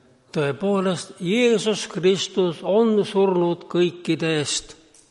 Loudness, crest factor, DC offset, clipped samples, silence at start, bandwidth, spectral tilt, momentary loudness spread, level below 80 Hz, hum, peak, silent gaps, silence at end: -22 LUFS; 14 dB; under 0.1%; under 0.1%; 0.35 s; 11.5 kHz; -5 dB/octave; 7 LU; -60 dBFS; none; -8 dBFS; none; 0.35 s